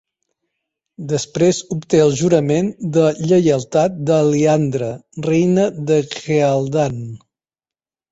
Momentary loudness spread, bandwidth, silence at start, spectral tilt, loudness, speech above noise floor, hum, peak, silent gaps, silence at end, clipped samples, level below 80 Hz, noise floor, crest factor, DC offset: 9 LU; 8.2 kHz; 1 s; -6.5 dB/octave; -17 LUFS; over 74 dB; none; -2 dBFS; none; 0.95 s; under 0.1%; -54 dBFS; under -90 dBFS; 16 dB; under 0.1%